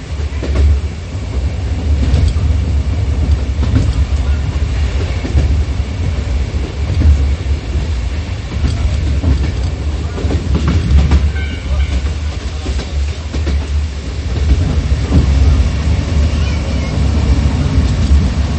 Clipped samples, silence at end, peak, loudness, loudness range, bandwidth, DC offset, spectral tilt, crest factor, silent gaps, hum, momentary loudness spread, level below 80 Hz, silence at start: under 0.1%; 0 s; 0 dBFS; -16 LUFS; 3 LU; 8.6 kHz; under 0.1%; -6.5 dB/octave; 14 dB; none; none; 7 LU; -14 dBFS; 0 s